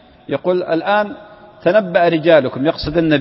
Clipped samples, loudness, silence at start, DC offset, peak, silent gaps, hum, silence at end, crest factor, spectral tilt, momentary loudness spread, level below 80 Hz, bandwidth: under 0.1%; -16 LUFS; 0.3 s; under 0.1%; 0 dBFS; none; none; 0 s; 16 dB; -10.5 dB/octave; 10 LU; -42 dBFS; 5.8 kHz